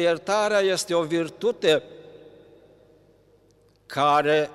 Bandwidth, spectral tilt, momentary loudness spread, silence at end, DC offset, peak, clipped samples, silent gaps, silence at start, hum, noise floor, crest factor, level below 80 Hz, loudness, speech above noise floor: 15 kHz; -4 dB/octave; 6 LU; 0 s; under 0.1%; -8 dBFS; under 0.1%; none; 0 s; none; -59 dBFS; 16 dB; -68 dBFS; -23 LUFS; 37 dB